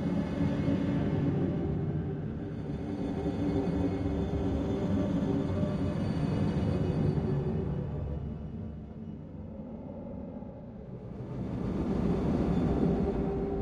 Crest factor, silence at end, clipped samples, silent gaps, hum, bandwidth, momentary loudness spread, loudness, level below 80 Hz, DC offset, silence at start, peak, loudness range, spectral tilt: 16 dB; 0 s; under 0.1%; none; none; 9.2 kHz; 13 LU; -32 LUFS; -44 dBFS; under 0.1%; 0 s; -16 dBFS; 9 LU; -9.5 dB/octave